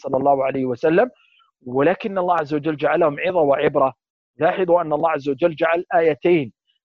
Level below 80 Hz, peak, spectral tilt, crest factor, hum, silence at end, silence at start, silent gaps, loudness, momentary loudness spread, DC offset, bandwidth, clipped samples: -60 dBFS; -4 dBFS; -8 dB/octave; 16 dB; none; 0.35 s; 0.05 s; 4.10-4.34 s; -19 LUFS; 5 LU; under 0.1%; 6.4 kHz; under 0.1%